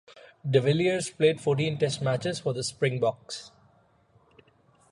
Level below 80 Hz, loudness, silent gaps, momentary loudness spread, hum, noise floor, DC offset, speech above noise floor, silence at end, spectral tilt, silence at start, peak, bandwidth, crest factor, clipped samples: -66 dBFS; -27 LUFS; none; 13 LU; none; -63 dBFS; under 0.1%; 37 dB; 1.45 s; -5.5 dB/octave; 0.15 s; -8 dBFS; 11.5 kHz; 20 dB; under 0.1%